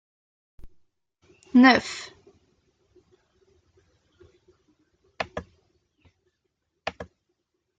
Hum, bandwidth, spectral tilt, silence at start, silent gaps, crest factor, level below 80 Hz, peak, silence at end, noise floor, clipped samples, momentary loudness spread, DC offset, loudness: none; 8.8 kHz; -4 dB/octave; 0.65 s; none; 26 dB; -60 dBFS; -2 dBFS; 0.75 s; -78 dBFS; under 0.1%; 28 LU; under 0.1%; -23 LUFS